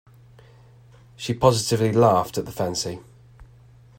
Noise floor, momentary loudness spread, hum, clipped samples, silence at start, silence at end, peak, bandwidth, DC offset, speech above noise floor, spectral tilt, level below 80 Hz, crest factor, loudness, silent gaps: -50 dBFS; 13 LU; none; under 0.1%; 1.2 s; 0.55 s; -2 dBFS; 16.5 kHz; under 0.1%; 29 dB; -5.5 dB/octave; -52 dBFS; 22 dB; -21 LUFS; none